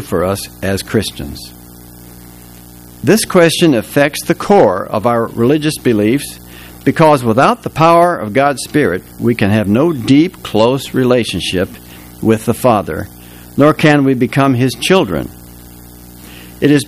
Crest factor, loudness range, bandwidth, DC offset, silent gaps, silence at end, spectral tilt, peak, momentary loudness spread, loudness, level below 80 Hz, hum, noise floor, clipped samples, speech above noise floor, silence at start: 14 dB; 3 LU; 16 kHz; under 0.1%; none; 0 s; -5.5 dB/octave; 0 dBFS; 13 LU; -13 LUFS; -40 dBFS; 60 Hz at -40 dBFS; -36 dBFS; 0.2%; 24 dB; 0 s